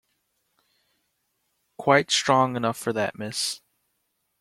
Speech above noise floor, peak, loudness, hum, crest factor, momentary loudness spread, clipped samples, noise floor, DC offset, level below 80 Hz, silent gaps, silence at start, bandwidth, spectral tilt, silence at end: 52 dB; -4 dBFS; -23 LUFS; none; 24 dB; 10 LU; under 0.1%; -75 dBFS; under 0.1%; -66 dBFS; none; 1.8 s; 16 kHz; -3.5 dB/octave; 0.85 s